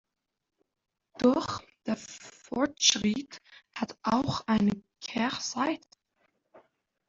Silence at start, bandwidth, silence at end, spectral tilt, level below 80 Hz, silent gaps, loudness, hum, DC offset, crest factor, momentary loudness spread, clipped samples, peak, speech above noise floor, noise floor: 1.2 s; 7.8 kHz; 0.5 s; -3.5 dB/octave; -64 dBFS; none; -29 LUFS; none; under 0.1%; 24 dB; 17 LU; under 0.1%; -8 dBFS; 46 dB; -75 dBFS